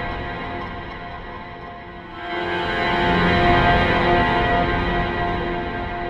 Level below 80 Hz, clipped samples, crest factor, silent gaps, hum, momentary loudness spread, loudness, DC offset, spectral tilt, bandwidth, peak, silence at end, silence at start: -32 dBFS; under 0.1%; 18 dB; none; none; 18 LU; -20 LUFS; under 0.1%; -7 dB/octave; 10 kHz; -4 dBFS; 0 s; 0 s